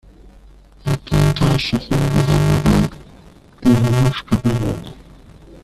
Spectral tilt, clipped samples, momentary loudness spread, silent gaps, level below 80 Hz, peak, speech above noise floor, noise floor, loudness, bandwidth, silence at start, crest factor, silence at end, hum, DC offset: -6.5 dB/octave; under 0.1%; 9 LU; none; -32 dBFS; -2 dBFS; 27 dB; -44 dBFS; -17 LUFS; 14 kHz; 0.85 s; 16 dB; 0.7 s; none; under 0.1%